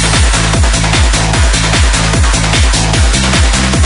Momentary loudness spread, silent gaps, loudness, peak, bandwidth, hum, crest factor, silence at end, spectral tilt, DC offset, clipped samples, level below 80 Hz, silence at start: 1 LU; none; -10 LUFS; 0 dBFS; 11 kHz; none; 8 dB; 0 s; -3.5 dB/octave; under 0.1%; under 0.1%; -12 dBFS; 0 s